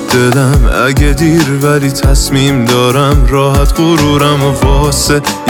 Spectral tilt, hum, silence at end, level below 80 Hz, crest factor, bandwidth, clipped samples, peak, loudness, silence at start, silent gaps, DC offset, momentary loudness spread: -5 dB/octave; none; 0 s; -14 dBFS; 8 dB; 19 kHz; under 0.1%; 0 dBFS; -9 LUFS; 0 s; none; under 0.1%; 2 LU